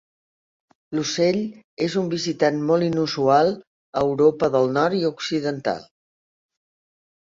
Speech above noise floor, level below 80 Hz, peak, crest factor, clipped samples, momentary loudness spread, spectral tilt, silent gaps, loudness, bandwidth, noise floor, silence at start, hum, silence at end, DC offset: over 69 dB; -62 dBFS; -4 dBFS; 18 dB; under 0.1%; 10 LU; -5.5 dB/octave; 1.64-1.77 s, 3.67-3.93 s; -22 LUFS; 7.6 kHz; under -90 dBFS; 0.9 s; none; 1.45 s; under 0.1%